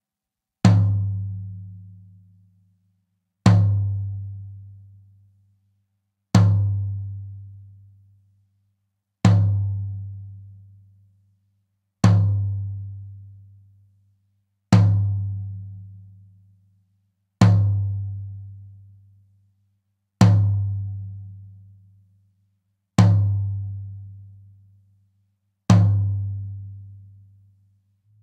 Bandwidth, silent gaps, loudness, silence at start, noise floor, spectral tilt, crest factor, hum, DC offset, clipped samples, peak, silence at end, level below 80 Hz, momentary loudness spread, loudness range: 8.6 kHz; none; -21 LUFS; 0.65 s; -87 dBFS; -7.5 dB/octave; 20 dB; none; under 0.1%; under 0.1%; -2 dBFS; 1.25 s; -52 dBFS; 25 LU; 2 LU